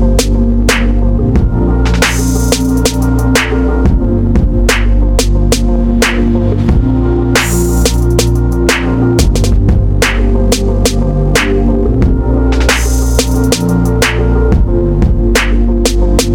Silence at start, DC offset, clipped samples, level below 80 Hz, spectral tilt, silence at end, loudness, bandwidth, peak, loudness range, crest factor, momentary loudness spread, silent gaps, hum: 0 s; under 0.1%; under 0.1%; -12 dBFS; -5 dB/octave; 0 s; -11 LUFS; 18.5 kHz; -2 dBFS; 0 LU; 8 dB; 2 LU; none; none